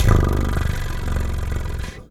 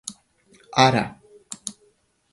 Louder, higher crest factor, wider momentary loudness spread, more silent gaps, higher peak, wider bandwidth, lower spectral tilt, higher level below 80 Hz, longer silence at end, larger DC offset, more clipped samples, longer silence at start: about the same, -23 LUFS vs -22 LUFS; second, 18 dB vs 24 dB; second, 9 LU vs 20 LU; neither; about the same, -2 dBFS vs 0 dBFS; first, 16 kHz vs 11.5 kHz; first, -6.5 dB/octave vs -4 dB/octave; first, -22 dBFS vs -58 dBFS; second, 0.05 s vs 0.6 s; neither; neither; about the same, 0 s vs 0.05 s